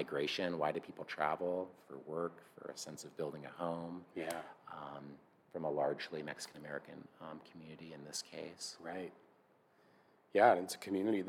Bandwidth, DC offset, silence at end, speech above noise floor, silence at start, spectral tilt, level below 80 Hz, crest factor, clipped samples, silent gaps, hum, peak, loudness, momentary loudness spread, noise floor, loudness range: 17 kHz; under 0.1%; 0 s; 30 dB; 0 s; -4 dB/octave; -84 dBFS; 26 dB; under 0.1%; none; none; -16 dBFS; -40 LUFS; 16 LU; -70 dBFS; 10 LU